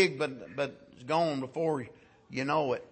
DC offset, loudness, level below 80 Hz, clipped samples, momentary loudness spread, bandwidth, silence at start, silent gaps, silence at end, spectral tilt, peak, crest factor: under 0.1%; -32 LUFS; -70 dBFS; under 0.1%; 10 LU; 8.8 kHz; 0 s; none; 0.05 s; -5.5 dB/octave; -12 dBFS; 20 dB